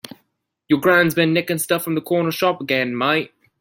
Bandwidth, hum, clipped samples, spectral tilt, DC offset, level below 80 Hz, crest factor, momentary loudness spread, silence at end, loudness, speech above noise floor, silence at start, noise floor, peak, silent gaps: 17 kHz; none; under 0.1%; -4.5 dB/octave; under 0.1%; -62 dBFS; 18 dB; 7 LU; 0.35 s; -19 LUFS; 52 dB; 0.05 s; -70 dBFS; -2 dBFS; none